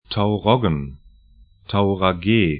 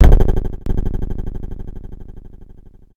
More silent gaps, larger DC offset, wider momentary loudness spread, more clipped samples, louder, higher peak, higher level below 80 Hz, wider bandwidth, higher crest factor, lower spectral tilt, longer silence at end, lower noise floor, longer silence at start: neither; neither; second, 8 LU vs 23 LU; second, under 0.1% vs 0.2%; about the same, -20 LUFS vs -22 LUFS; about the same, 0 dBFS vs 0 dBFS; second, -42 dBFS vs -18 dBFS; second, 5 kHz vs 6.6 kHz; about the same, 20 dB vs 16 dB; first, -12 dB/octave vs -8.5 dB/octave; second, 0 s vs 0.5 s; first, -51 dBFS vs -41 dBFS; about the same, 0.1 s vs 0 s